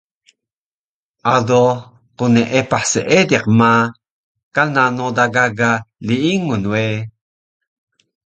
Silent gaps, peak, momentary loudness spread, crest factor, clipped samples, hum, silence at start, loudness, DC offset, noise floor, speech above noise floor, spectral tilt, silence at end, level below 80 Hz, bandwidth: 4.11-4.35 s, 4.43-4.51 s; 0 dBFS; 9 LU; 16 dB; under 0.1%; none; 1.25 s; -15 LUFS; under 0.1%; under -90 dBFS; over 75 dB; -5 dB/octave; 1.2 s; -52 dBFS; 9.2 kHz